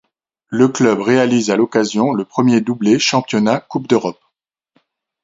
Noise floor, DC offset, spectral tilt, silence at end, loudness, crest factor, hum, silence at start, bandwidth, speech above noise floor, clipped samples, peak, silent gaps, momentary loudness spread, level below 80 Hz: -73 dBFS; under 0.1%; -5 dB/octave; 1.1 s; -15 LUFS; 16 dB; none; 0.5 s; 7.8 kHz; 59 dB; under 0.1%; 0 dBFS; none; 4 LU; -60 dBFS